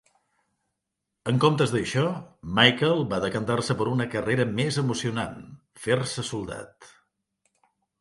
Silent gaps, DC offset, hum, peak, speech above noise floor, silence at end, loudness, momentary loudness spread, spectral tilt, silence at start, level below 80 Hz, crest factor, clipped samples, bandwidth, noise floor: none; under 0.1%; none; 0 dBFS; 58 dB; 1.15 s; -25 LUFS; 16 LU; -5 dB/octave; 1.25 s; -56 dBFS; 26 dB; under 0.1%; 11.5 kHz; -83 dBFS